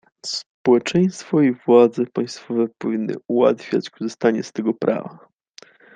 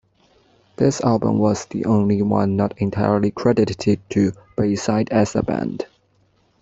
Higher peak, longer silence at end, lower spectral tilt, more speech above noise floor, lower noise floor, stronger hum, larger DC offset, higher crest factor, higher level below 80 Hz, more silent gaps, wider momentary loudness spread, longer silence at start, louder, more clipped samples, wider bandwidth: about the same, -2 dBFS vs -2 dBFS; about the same, 0.85 s vs 0.75 s; about the same, -6 dB/octave vs -7 dB/octave; second, 30 dB vs 42 dB; second, -49 dBFS vs -61 dBFS; neither; neither; about the same, 18 dB vs 18 dB; second, -64 dBFS vs -50 dBFS; first, 0.46-0.65 s vs none; first, 12 LU vs 6 LU; second, 0.25 s vs 0.8 s; about the same, -20 LUFS vs -20 LUFS; neither; first, 9.4 kHz vs 8 kHz